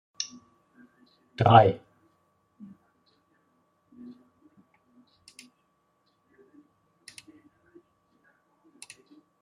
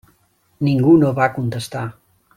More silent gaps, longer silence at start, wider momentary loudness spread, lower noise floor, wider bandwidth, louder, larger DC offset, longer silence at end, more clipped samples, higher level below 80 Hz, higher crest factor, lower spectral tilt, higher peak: neither; second, 0.2 s vs 0.6 s; first, 32 LU vs 15 LU; first, -72 dBFS vs -60 dBFS; second, 11.5 kHz vs 14 kHz; second, -23 LUFS vs -17 LUFS; neither; first, 7.65 s vs 0.45 s; neither; second, -68 dBFS vs -54 dBFS; first, 28 dB vs 16 dB; second, -6 dB/octave vs -7.5 dB/octave; about the same, -4 dBFS vs -2 dBFS